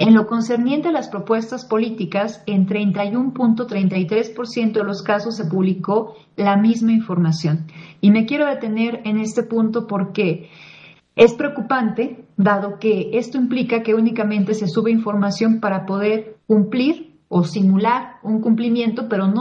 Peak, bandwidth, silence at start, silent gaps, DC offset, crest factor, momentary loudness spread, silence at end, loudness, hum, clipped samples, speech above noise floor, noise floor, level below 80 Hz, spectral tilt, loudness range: 0 dBFS; 7.8 kHz; 0 s; none; under 0.1%; 18 dB; 7 LU; 0 s; -19 LUFS; none; under 0.1%; 27 dB; -45 dBFS; -66 dBFS; -7.5 dB/octave; 2 LU